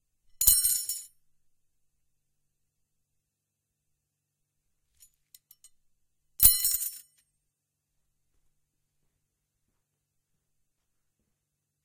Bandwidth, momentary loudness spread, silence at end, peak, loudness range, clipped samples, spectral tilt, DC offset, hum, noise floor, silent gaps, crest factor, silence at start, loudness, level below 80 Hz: 16 kHz; 16 LU; 4.85 s; 0 dBFS; 10 LU; under 0.1%; 1 dB/octave; under 0.1%; none; -84 dBFS; none; 34 dB; 0.4 s; -22 LUFS; -52 dBFS